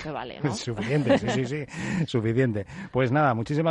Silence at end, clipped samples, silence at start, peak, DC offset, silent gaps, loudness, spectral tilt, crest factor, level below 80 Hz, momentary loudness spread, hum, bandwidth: 0 s; under 0.1%; 0 s; -10 dBFS; under 0.1%; none; -26 LUFS; -6.5 dB/octave; 16 dB; -54 dBFS; 8 LU; none; 11 kHz